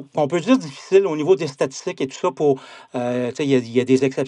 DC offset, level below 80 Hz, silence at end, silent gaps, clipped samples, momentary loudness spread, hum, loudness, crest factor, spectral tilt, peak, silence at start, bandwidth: under 0.1%; -70 dBFS; 0 s; none; under 0.1%; 9 LU; none; -20 LUFS; 18 dB; -6 dB/octave; -2 dBFS; 0 s; 10.5 kHz